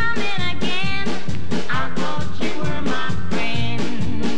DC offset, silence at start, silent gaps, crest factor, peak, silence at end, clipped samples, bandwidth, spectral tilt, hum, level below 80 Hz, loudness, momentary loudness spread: 20%; 0 s; none; 12 dB; -6 dBFS; 0 s; under 0.1%; 10.5 kHz; -5 dB/octave; none; -40 dBFS; -24 LUFS; 4 LU